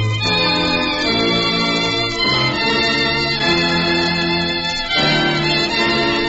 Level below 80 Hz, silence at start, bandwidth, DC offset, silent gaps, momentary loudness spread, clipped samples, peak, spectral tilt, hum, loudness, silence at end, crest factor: -38 dBFS; 0 s; 8 kHz; under 0.1%; none; 2 LU; under 0.1%; -4 dBFS; -2 dB/octave; none; -15 LUFS; 0 s; 12 dB